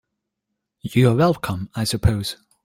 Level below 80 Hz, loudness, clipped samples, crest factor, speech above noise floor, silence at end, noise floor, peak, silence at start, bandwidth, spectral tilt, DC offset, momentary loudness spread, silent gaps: -40 dBFS; -20 LUFS; under 0.1%; 18 dB; 61 dB; 0.3 s; -80 dBFS; -4 dBFS; 0.85 s; 16.5 kHz; -6 dB/octave; under 0.1%; 12 LU; none